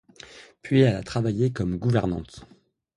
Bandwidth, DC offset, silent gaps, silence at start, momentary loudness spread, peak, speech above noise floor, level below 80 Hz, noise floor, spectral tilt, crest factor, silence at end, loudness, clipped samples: 11 kHz; under 0.1%; none; 0.35 s; 24 LU; -6 dBFS; 24 dB; -48 dBFS; -48 dBFS; -7.5 dB/octave; 20 dB; 0.5 s; -24 LUFS; under 0.1%